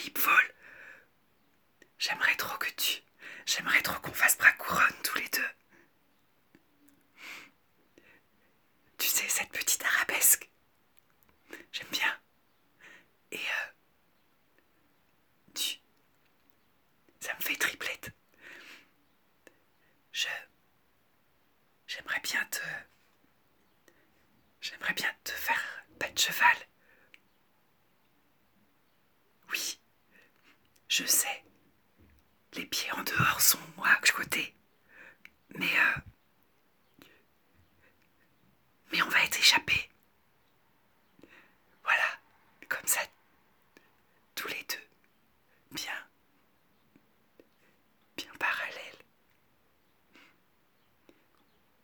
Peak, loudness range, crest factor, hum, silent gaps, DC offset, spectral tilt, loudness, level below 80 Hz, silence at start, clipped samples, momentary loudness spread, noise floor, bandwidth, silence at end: -8 dBFS; 14 LU; 28 dB; none; none; under 0.1%; 0 dB/octave; -29 LUFS; -70 dBFS; 0 s; under 0.1%; 22 LU; -71 dBFS; over 20 kHz; 2.9 s